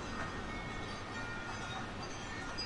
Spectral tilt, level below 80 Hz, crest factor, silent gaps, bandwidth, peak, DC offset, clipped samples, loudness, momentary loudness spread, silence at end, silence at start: -4 dB/octave; -52 dBFS; 14 dB; none; 11.5 kHz; -28 dBFS; under 0.1%; under 0.1%; -42 LUFS; 1 LU; 0 s; 0 s